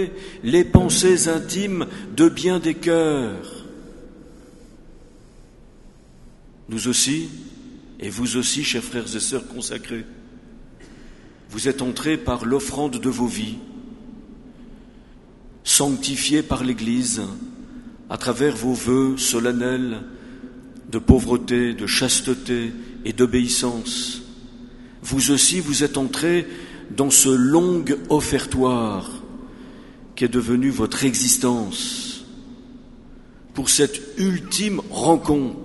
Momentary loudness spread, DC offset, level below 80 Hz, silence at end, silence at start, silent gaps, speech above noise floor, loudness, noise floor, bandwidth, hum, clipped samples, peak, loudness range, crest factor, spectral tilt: 22 LU; under 0.1%; -42 dBFS; 0 s; 0 s; none; 26 dB; -20 LUFS; -46 dBFS; 12 kHz; none; under 0.1%; 0 dBFS; 8 LU; 22 dB; -3.5 dB/octave